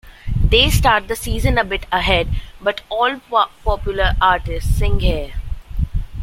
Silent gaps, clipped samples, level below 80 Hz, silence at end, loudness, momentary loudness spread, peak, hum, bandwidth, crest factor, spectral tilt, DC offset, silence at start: none; under 0.1%; -22 dBFS; 0 s; -18 LUFS; 12 LU; 0 dBFS; none; 16.5 kHz; 16 dB; -4.5 dB/octave; under 0.1%; 0.05 s